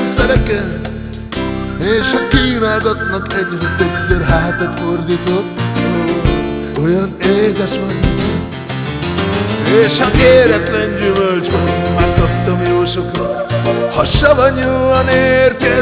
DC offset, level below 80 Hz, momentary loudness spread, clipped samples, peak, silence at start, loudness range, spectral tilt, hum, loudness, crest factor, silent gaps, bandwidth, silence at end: under 0.1%; -26 dBFS; 8 LU; under 0.1%; 0 dBFS; 0 s; 4 LU; -10.5 dB/octave; none; -14 LUFS; 12 dB; none; 4 kHz; 0 s